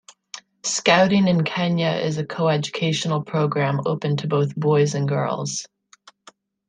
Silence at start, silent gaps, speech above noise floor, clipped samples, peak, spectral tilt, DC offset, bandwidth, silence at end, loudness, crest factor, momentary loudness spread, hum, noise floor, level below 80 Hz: 0.35 s; none; 32 dB; under 0.1%; -2 dBFS; -5 dB/octave; under 0.1%; 9.8 kHz; 1.05 s; -21 LUFS; 20 dB; 10 LU; none; -53 dBFS; -62 dBFS